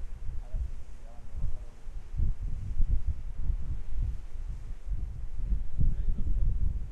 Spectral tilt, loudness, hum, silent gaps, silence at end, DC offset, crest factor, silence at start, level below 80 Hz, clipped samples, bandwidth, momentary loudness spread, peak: -8.5 dB/octave; -37 LUFS; none; none; 0 s; under 0.1%; 16 dB; 0 s; -30 dBFS; under 0.1%; 2.3 kHz; 12 LU; -12 dBFS